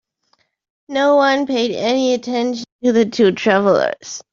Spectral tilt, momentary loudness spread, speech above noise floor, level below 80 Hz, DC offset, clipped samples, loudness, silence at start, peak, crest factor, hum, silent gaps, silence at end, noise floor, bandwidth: -4.5 dB/octave; 8 LU; 48 dB; -62 dBFS; under 0.1%; under 0.1%; -16 LUFS; 0.9 s; -2 dBFS; 14 dB; none; 2.72-2.79 s; 0.1 s; -63 dBFS; 7.6 kHz